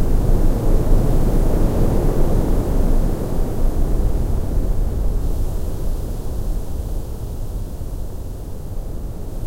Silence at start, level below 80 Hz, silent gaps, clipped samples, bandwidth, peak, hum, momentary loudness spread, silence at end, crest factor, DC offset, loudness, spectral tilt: 0 s; -18 dBFS; none; under 0.1%; 16 kHz; -2 dBFS; none; 11 LU; 0 s; 14 dB; under 0.1%; -23 LUFS; -8 dB/octave